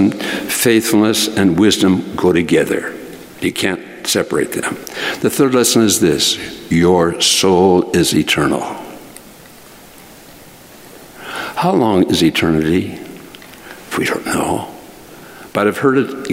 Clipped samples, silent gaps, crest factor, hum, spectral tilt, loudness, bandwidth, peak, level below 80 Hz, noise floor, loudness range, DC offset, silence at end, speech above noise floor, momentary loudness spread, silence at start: under 0.1%; none; 16 dB; none; -4 dB/octave; -14 LUFS; 16 kHz; 0 dBFS; -48 dBFS; -39 dBFS; 8 LU; under 0.1%; 0 s; 25 dB; 19 LU; 0 s